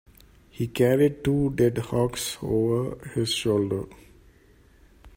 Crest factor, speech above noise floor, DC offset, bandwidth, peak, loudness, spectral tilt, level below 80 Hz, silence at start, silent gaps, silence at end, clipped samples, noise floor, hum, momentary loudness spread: 18 dB; 32 dB; under 0.1%; 16 kHz; -8 dBFS; -25 LUFS; -6 dB/octave; -50 dBFS; 0.55 s; none; 0.1 s; under 0.1%; -56 dBFS; none; 10 LU